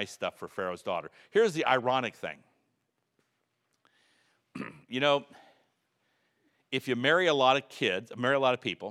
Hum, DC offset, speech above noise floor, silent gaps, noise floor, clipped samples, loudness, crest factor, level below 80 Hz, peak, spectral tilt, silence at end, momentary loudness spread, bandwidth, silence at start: none; under 0.1%; 50 dB; none; -79 dBFS; under 0.1%; -29 LUFS; 22 dB; -82 dBFS; -10 dBFS; -4.5 dB/octave; 0 s; 16 LU; 14.5 kHz; 0 s